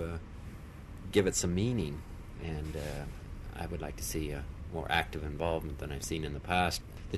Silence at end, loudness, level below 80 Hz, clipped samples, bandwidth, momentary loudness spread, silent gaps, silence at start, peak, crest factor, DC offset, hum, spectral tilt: 0 s; -35 LUFS; -44 dBFS; under 0.1%; 13 kHz; 16 LU; none; 0 s; -14 dBFS; 22 dB; under 0.1%; none; -4.5 dB/octave